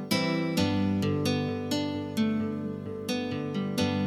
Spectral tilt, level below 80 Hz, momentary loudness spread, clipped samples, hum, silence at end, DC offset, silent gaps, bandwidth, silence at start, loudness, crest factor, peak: -5.5 dB/octave; -62 dBFS; 6 LU; under 0.1%; none; 0 s; under 0.1%; none; 17 kHz; 0 s; -29 LUFS; 16 dB; -12 dBFS